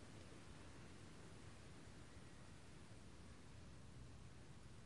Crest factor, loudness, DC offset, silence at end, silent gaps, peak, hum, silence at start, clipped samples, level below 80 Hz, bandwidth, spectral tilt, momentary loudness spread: 14 dB; -61 LUFS; under 0.1%; 0 s; none; -46 dBFS; none; 0 s; under 0.1%; -68 dBFS; 12 kHz; -5 dB/octave; 2 LU